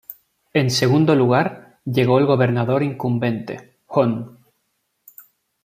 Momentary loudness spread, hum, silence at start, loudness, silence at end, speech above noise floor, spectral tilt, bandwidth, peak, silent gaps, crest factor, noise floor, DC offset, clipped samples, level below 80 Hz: 17 LU; none; 0.1 s; -19 LUFS; 1.35 s; 54 dB; -6.5 dB/octave; 16 kHz; -2 dBFS; none; 18 dB; -71 dBFS; under 0.1%; under 0.1%; -60 dBFS